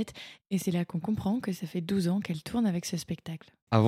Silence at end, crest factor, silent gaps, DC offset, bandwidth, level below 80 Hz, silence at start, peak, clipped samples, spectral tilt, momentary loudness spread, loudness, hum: 0 s; 22 dB; 3.62-3.67 s; under 0.1%; 16 kHz; -62 dBFS; 0 s; -8 dBFS; under 0.1%; -6.5 dB/octave; 9 LU; -32 LUFS; none